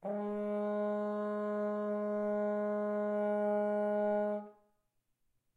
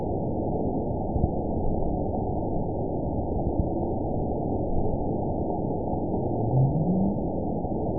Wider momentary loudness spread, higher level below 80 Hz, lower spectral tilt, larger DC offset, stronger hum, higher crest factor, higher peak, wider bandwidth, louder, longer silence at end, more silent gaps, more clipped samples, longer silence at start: about the same, 4 LU vs 5 LU; second, -82 dBFS vs -36 dBFS; second, -9 dB/octave vs -19 dB/octave; second, under 0.1% vs 1%; neither; second, 10 dB vs 16 dB; second, -24 dBFS vs -10 dBFS; first, 4.4 kHz vs 1 kHz; second, -35 LUFS vs -28 LUFS; first, 1.05 s vs 0 s; neither; neither; about the same, 0 s vs 0 s